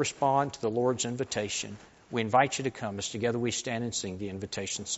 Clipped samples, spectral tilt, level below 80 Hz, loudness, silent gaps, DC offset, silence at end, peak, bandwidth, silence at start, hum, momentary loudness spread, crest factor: under 0.1%; -4 dB/octave; -64 dBFS; -30 LUFS; none; under 0.1%; 0 s; -10 dBFS; 8 kHz; 0 s; none; 10 LU; 22 dB